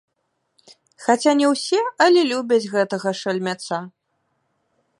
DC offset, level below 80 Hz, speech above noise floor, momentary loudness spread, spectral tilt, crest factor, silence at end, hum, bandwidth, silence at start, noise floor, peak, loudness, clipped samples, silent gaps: under 0.1%; -76 dBFS; 54 dB; 11 LU; -4 dB/octave; 20 dB; 1.1 s; none; 11.5 kHz; 1 s; -73 dBFS; -2 dBFS; -20 LUFS; under 0.1%; none